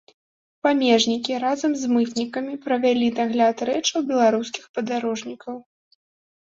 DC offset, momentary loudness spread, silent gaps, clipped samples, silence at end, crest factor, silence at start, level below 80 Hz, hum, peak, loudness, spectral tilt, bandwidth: under 0.1%; 11 LU; 4.69-4.74 s; under 0.1%; 0.95 s; 18 dB; 0.65 s; -68 dBFS; none; -6 dBFS; -22 LUFS; -3.5 dB/octave; 7.8 kHz